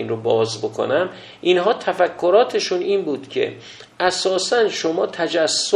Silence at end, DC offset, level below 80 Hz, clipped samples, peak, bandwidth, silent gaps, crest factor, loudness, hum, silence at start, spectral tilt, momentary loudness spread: 0 s; under 0.1%; -64 dBFS; under 0.1%; -2 dBFS; 11.5 kHz; none; 18 dB; -19 LUFS; none; 0 s; -3 dB/octave; 8 LU